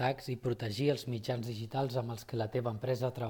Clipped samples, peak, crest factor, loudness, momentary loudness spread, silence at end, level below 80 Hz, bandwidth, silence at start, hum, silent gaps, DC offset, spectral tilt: under 0.1%; -16 dBFS; 18 dB; -36 LUFS; 5 LU; 0 s; -66 dBFS; 18 kHz; 0 s; none; none; under 0.1%; -6.5 dB/octave